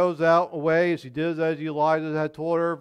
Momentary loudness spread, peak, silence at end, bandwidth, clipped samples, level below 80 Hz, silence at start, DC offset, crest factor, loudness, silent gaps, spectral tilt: 7 LU; -8 dBFS; 0 s; 9.8 kHz; under 0.1%; -66 dBFS; 0 s; under 0.1%; 16 dB; -24 LUFS; none; -7.5 dB/octave